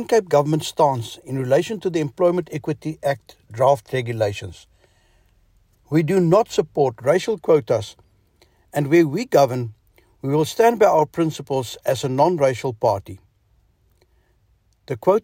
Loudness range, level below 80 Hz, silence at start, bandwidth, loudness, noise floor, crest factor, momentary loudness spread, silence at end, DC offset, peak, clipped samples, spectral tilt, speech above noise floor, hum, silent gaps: 4 LU; -58 dBFS; 0 s; 16.5 kHz; -20 LUFS; -61 dBFS; 16 dB; 12 LU; 0.05 s; under 0.1%; -4 dBFS; under 0.1%; -6.5 dB/octave; 42 dB; none; none